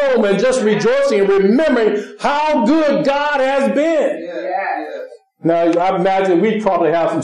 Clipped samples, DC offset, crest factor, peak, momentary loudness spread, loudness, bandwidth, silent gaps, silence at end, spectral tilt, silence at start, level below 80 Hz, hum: under 0.1%; 0.6%; 12 dB; -2 dBFS; 9 LU; -15 LUFS; 11 kHz; none; 0 s; -5.5 dB/octave; 0 s; -54 dBFS; none